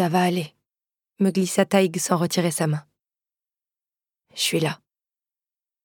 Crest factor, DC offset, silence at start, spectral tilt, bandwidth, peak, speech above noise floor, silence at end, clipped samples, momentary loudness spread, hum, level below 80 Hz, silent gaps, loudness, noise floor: 20 dB; under 0.1%; 0 s; -4.5 dB/octave; 18.5 kHz; -4 dBFS; over 68 dB; 1.1 s; under 0.1%; 11 LU; none; -74 dBFS; none; -23 LUFS; under -90 dBFS